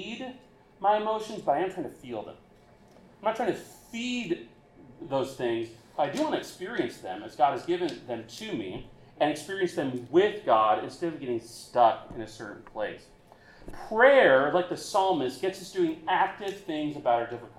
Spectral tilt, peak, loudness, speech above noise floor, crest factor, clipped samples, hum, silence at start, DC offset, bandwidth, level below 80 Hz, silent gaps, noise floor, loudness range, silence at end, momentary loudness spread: -5 dB/octave; -8 dBFS; -28 LUFS; 28 dB; 22 dB; under 0.1%; none; 0 s; under 0.1%; 14.5 kHz; -60 dBFS; none; -56 dBFS; 8 LU; 0.1 s; 16 LU